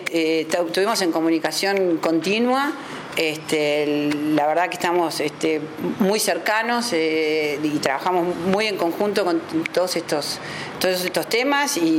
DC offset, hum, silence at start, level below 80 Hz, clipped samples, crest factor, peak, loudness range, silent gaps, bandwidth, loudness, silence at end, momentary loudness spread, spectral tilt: under 0.1%; none; 0 s; -64 dBFS; under 0.1%; 20 dB; 0 dBFS; 1 LU; none; 17 kHz; -21 LUFS; 0 s; 4 LU; -3.5 dB/octave